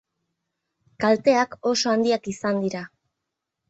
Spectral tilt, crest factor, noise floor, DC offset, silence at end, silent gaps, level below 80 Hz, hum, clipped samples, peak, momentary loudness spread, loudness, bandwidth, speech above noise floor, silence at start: -4 dB/octave; 18 dB; -83 dBFS; under 0.1%; 0.85 s; none; -66 dBFS; none; under 0.1%; -6 dBFS; 10 LU; -22 LUFS; 8.2 kHz; 61 dB; 1 s